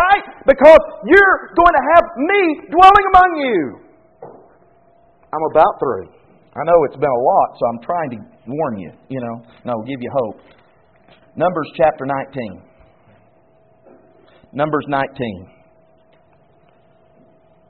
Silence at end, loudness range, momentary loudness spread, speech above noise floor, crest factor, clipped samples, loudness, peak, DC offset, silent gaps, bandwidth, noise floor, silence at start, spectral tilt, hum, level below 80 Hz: 2.25 s; 14 LU; 19 LU; 39 dB; 16 dB; 0.3%; -14 LUFS; 0 dBFS; 0.1%; none; 4.5 kHz; -53 dBFS; 0 s; -3 dB/octave; none; -42 dBFS